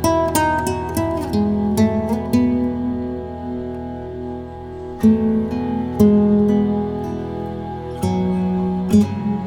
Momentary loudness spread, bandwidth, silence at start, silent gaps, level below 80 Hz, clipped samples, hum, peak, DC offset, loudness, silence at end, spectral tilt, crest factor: 14 LU; 18.5 kHz; 0 s; none; -42 dBFS; under 0.1%; none; 0 dBFS; under 0.1%; -19 LUFS; 0 s; -7 dB/octave; 18 dB